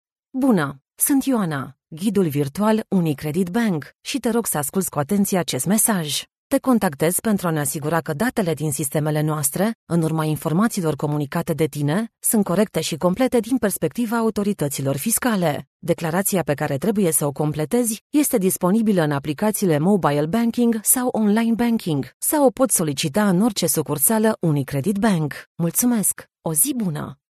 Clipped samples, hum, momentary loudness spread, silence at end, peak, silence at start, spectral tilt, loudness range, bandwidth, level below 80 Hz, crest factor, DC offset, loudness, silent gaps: under 0.1%; none; 6 LU; 0.15 s; -4 dBFS; 0.35 s; -5 dB/octave; 3 LU; 13.5 kHz; -54 dBFS; 16 dB; under 0.1%; -20 LUFS; 6.37-6.50 s, 9.75-9.87 s, 15.67-15.80 s, 18.01-18.10 s, 22.14-22.20 s, 25.47-25.55 s